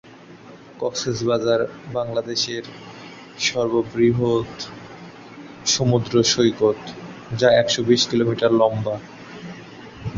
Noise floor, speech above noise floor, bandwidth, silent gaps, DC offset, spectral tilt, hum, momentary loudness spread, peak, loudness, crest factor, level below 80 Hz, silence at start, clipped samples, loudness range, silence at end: -43 dBFS; 23 dB; 7.8 kHz; none; under 0.1%; -4.5 dB/octave; none; 21 LU; -2 dBFS; -20 LUFS; 18 dB; -54 dBFS; 0.05 s; under 0.1%; 5 LU; 0 s